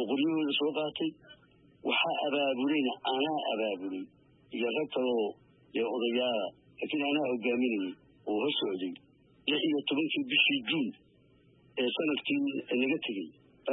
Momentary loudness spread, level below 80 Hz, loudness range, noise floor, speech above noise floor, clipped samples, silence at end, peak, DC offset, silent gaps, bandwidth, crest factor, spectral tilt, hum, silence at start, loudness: 11 LU; -80 dBFS; 3 LU; -63 dBFS; 32 dB; under 0.1%; 0 s; -14 dBFS; under 0.1%; none; 4.1 kHz; 18 dB; -8 dB/octave; none; 0 s; -31 LUFS